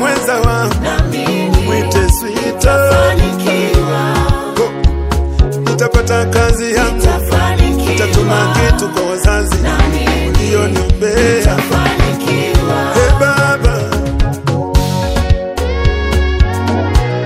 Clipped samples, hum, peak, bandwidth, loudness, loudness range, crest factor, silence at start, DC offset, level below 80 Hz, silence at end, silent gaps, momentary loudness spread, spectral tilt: 0.3%; none; 0 dBFS; 16.5 kHz; -13 LUFS; 2 LU; 12 dB; 0 s; under 0.1%; -16 dBFS; 0 s; none; 4 LU; -5.5 dB/octave